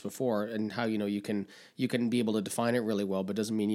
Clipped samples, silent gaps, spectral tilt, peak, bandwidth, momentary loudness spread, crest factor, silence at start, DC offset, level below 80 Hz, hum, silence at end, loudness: under 0.1%; none; -5.5 dB/octave; -16 dBFS; 16 kHz; 6 LU; 16 dB; 0 s; under 0.1%; -82 dBFS; none; 0 s; -32 LUFS